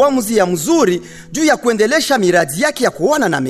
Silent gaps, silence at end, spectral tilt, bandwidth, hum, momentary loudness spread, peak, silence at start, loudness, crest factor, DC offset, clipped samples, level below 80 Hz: none; 0 s; -4 dB/octave; 14 kHz; none; 4 LU; -2 dBFS; 0 s; -14 LUFS; 12 dB; under 0.1%; under 0.1%; -50 dBFS